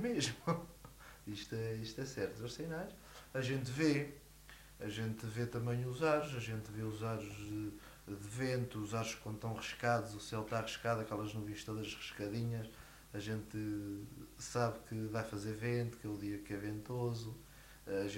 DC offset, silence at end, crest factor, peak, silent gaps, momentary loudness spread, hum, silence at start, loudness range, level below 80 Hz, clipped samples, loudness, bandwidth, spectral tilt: under 0.1%; 0 s; 20 dB; -22 dBFS; none; 14 LU; none; 0 s; 3 LU; -62 dBFS; under 0.1%; -41 LUFS; 16 kHz; -5.5 dB/octave